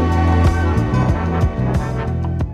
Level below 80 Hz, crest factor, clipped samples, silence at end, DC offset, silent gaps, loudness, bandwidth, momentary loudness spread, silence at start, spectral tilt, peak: -24 dBFS; 14 dB; under 0.1%; 0 s; under 0.1%; none; -18 LUFS; 9 kHz; 6 LU; 0 s; -8 dB/octave; -2 dBFS